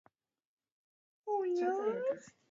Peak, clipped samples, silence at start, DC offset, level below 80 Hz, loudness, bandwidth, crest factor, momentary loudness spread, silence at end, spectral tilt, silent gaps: -24 dBFS; under 0.1%; 1.25 s; under 0.1%; -90 dBFS; -36 LUFS; 7.6 kHz; 14 dB; 10 LU; 0.2 s; -5 dB/octave; none